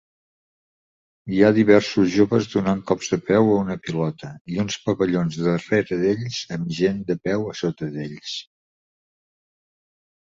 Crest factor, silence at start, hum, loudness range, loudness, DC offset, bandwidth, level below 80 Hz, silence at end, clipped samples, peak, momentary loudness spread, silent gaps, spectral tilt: 20 dB; 1.25 s; none; 8 LU; -21 LUFS; under 0.1%; 7.8 kHz; -54 dBFS; 1.95 s; under 0.1%; -2 dBFS; 13 LU; 4.41-4.45 s; -6 dB/octave